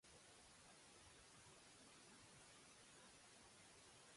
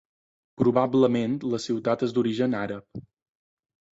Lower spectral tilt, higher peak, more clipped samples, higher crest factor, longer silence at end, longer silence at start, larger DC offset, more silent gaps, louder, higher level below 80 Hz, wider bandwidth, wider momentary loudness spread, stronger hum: second, -2 dB/octave vs -7 dB/octave; second, -54 dBFS vs -8 dBFS; neither; about the same, 14 dB vs 18 dB; second, 0 s vs 0.95 s; second, 0.05 s vs 0.6 s; neither; neither; second, -65 LUFS vs -25 LUFS; second, -84 dBFS vs -64 dBFS; first, 11.5 kHz vs 7.8 kHz; second, 1 LU vs 14 LU; neither